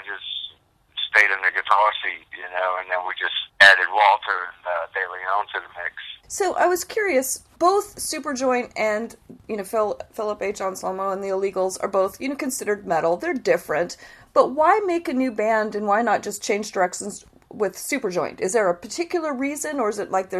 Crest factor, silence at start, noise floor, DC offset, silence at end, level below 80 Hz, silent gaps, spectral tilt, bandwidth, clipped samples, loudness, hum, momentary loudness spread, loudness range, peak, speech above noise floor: 22 dB; 0 s; -53 dBFS; under 0.1%; 0 s; -62 dBFS; none; -2.5 dB/octave; 14 kHz; under 0.1%; -22 LUFS; none; 12 LU; 7 LU; 0 dBFS; 30 dB